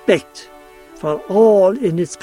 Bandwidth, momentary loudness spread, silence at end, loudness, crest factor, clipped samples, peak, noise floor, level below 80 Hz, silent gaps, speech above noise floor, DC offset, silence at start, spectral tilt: 12.5 kHz; 14 LU; 0.1 s; -15 LUFS; 16 dB; under 0.1%; 0 dBFS; -41 dBFS; -54 dBFS; none; 26 dB; under 0.1%; 0.05 s; -6 dB/octave